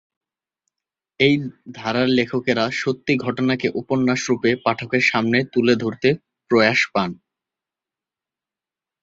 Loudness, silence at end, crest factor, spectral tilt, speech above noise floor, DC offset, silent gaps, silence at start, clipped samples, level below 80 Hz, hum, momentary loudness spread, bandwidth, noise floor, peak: -20 LUFS; 1.9 s; 20 dB; -5.5 dB/octave; 70 dB; under 0.1%; none; 1.2 s; under 0.1%; -58 dBFS; none; 6 LU; 7.8 kHz; -89 dBFS; 0 dBFS